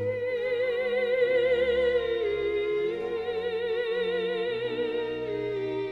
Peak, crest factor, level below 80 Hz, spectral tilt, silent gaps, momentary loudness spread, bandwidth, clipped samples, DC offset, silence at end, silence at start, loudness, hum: -14 dBFS; 14 dB; -56 dBFS; -6 dB/octave; none; 7 LU; 5.8 kHz; under 0.1%; under 0.1%; 0 s; 0 s; -28 LUFS; none